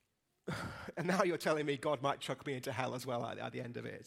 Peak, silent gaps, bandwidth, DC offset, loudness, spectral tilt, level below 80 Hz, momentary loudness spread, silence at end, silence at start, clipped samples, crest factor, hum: -16 dBFS; none; 16 kHz; under 0.1%; -38 LUFS; -5 dB/octave; -72 dBFS; 11 LU; 0 s; 0.45 s; under 0.1%; 24 dB; none